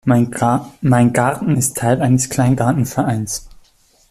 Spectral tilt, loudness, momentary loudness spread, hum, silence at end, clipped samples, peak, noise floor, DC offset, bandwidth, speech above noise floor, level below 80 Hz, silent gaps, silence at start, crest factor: -6 dB/octave; -16 LUFS; 5 LU; none; 0.6 s; under 0.1%; -2 dBFS; -53 dBFS; under 0.1%; 15 kHz; 37 dB; -46 dBFS; none; 0.05 s; 14 dB